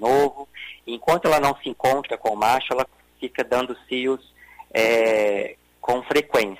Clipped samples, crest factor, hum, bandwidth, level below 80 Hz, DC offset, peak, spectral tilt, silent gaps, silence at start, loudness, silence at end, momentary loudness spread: under 0.1%; 16 dB; none; 16 kHz; -56 dBFS; under 0.1%; -6 dBFS; -4 dB/octave; none; 0 s; -22 LUFS; 0.05 s; 13 LU